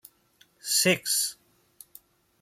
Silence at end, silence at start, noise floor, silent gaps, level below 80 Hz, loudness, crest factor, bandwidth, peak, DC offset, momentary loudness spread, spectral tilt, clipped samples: 1.1 s; 0.65 s; -63 dBFS; none; -74 dBFS; -24 LUFS; 20 dB; 16.5 kHz; -10 dBFS; under 0.1%; 10 LU; -1.5 dB/octave; under 0.1%